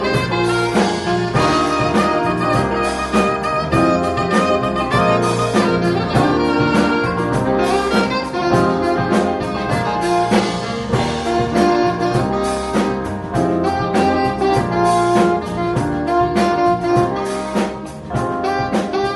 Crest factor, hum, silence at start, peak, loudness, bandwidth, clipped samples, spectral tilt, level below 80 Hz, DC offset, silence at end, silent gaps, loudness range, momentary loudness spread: 16 dB; none; 0 s; 0 dBFS; -17 LUFS; 11.5 kHz; under 0.1%; -6 dB/octave; -38 dBFS; under 0.1%; 0 s; none; 2 LU; 5 LU